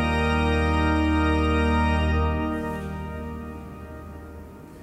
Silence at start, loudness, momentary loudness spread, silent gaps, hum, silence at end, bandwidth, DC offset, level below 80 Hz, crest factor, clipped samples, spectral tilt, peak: 0 s; -24 LUFS; 18 LU; none; none; 0 s; 9.6 kHz; under 0.1%; -30 dBFS; 14 dB; under 0.1%; -7 dB/octave; -10 dBFS